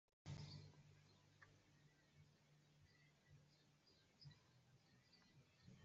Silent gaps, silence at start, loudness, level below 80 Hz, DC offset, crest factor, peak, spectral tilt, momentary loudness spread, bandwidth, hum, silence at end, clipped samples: none; 0.25 s; -61 LUFS; -86 dBFS; under 0.1%; 22 dB; -44 dBFS; -5 dB/octave; 10 LU; 7.6 kHz; none; 0 s; under 0.1%